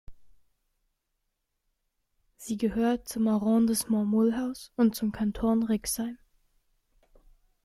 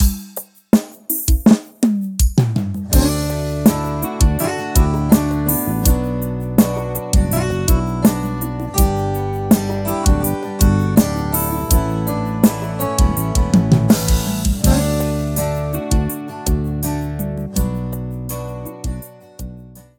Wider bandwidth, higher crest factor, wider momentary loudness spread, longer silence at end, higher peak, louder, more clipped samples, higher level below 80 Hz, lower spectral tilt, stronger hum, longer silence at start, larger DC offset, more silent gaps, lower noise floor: second, 15 kHz vs 19 kHz; about the same, 18 dB vs 16 dB; about the same, 9 LU vs 10 LU; first, 1.5 s vs 0.2 s; second, -12 dBFS vs 0 dBFS; second, -28 LUFS vs -18 LUFS; neither; second, -54 dBFS vs -22 dBFS; about the same, -5.5 dB/octave vs -6 dB/octave; neither; about the same, 0.1 s vs 0 s; neither; neither; first, -80 dBFS vs -38 dBFS